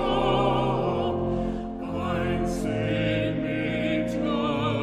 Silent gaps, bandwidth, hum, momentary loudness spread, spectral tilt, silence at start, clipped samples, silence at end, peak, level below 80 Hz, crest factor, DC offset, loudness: none; 13.5 kHz; none; 6 LU; -7 dB/octave; 0 s; under 0.1%; 0 s; -12 dBFS; -40 dBFS; 14 dB; under 0.1%; -26 LUFS